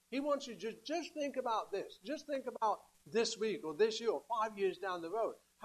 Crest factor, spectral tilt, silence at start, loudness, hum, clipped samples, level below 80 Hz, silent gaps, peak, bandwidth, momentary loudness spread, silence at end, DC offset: 18 dB; -3.5 dB/octave; 0.1 s; -38 LUFS; none; under 0.1%; -82 dBFS; none; -20 dBFS; 13.5 kHz; 9 LU; 0 s; under 0.1%